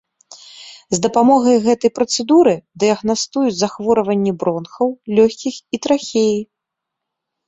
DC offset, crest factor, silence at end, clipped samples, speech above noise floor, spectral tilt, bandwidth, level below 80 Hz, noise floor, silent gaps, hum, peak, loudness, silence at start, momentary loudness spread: under 0.1%; 16 dB; 1.05 s; under 0.1%; 65 dB; -4.5 dB/octave; 8.2 kHz; -58 dBFS; -80 dBFS; none; none; -2 dBFS; -16 LUFS; 0.55 s; 11 LU